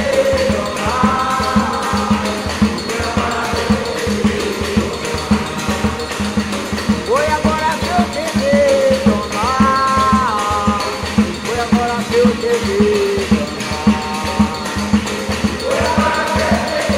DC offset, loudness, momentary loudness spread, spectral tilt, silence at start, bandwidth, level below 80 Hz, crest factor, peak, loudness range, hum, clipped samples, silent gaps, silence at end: 0.1%; -16 LUFS; 6 LU; -5 dB/octave; 0 s; 16 kHz; -32 dBFS; 14 dB; -2 dBFS; 3 LU; none; under 0.1%; none; 0 s